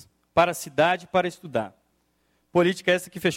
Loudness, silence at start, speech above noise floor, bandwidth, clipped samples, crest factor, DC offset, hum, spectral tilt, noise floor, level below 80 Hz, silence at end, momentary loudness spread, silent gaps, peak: -24 LUFS; 0.35 s; 46 dB; 16.5 kHz; under 0.1%; 20 dB; under 0.1%; none; -4.5 dB/octave; -69 dBFS; -60 dBFS; 0 s; 9 LU; none; -6 dBFS